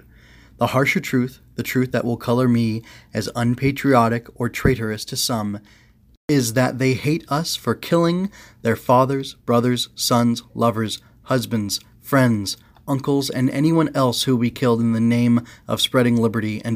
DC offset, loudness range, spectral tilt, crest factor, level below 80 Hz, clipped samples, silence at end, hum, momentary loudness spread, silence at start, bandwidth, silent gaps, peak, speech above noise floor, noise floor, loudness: under 0.1%; 3 LU; -5.5 dB/octave; 18 dB; -46 dBFS; under 0.1%; 0 s; none; 9 LU; 0.6 s; 16 kHz; 6.17-6.28 s; -2 dBFS; 28 dB; -48 dBFS; -20 LUFS